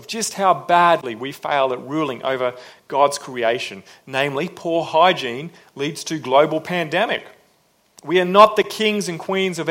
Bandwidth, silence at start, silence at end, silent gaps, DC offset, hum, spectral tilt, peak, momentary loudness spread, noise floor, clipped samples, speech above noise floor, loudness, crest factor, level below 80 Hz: 16.5 kHz; 0 s; 0 s; none; under 0.1%; none; -4 dB/octave; 0 dBFS; 12 LU; -60 dBFS; under 0.1%; 41 dB; -19 LUFS; 20 dB; -66 dBFS